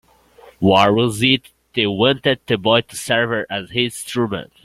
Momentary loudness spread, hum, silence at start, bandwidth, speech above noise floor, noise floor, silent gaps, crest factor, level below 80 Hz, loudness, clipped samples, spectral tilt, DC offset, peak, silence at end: 9 LU; none; 0.45 s; 16 kHz; 30 dB; -47 dBFS; none; 18 dB; -52 dBFS; -18 LUFS; under 0.1%; -4.5 dB/octave; under 0.1%; -2 dBFS; 0.2 s